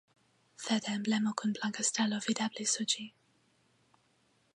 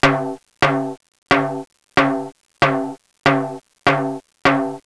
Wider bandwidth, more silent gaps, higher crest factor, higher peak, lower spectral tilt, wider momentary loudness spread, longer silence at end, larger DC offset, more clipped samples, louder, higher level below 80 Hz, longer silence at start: about the same, 11.5 kHz vs 11 kHz; second, none vs 1.18-1.22 s; first, 20 dB vs 14 dB; second, -14 dBFS vs -6 dBFS; second, -2.5 dB/octave vs -5.5 dB/octave; second, 4 LU vs 12 LU; first, 1.45 s vs 0.05 s; second, under 0.1% vs 0.2%; neither; second, -33 LUFS vs -19 LUFS; second, -84 dBFS vs -48 dBFS; first, 0.6 s vs 0 s